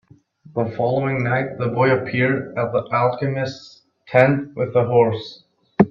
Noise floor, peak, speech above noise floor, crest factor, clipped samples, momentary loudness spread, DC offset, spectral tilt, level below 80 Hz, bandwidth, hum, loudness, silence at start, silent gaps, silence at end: -49 dBFS; 0 dBFS; 29 dB; 20 dB; under 0.1%; 12 LU; under 0.1%; -8.5 dB/octave; -58 dBFS; 7.2 kHz; none; -20 LUFS; 0.55 s; none; 0 s